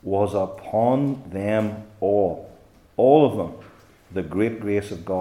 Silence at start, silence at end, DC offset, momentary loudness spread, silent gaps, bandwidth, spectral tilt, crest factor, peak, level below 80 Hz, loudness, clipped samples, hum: 0.05 s; 0 s; under 0.1%; 14 LU; none; 13 kHz; -8 dB/octave; 20 dB; -2 dBFS; -58 dBFS; -22 LUFS; under 0.1%; none